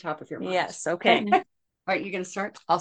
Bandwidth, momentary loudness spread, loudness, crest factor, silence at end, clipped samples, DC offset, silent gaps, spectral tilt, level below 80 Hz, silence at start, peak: 10 kHz; 12 LU; -26 LUFS; 22 dB; 0 s; under 0.1%; under 0.1%; none; -4 dB/octave; -74 dBFS; 0.05 s; -4 dBFS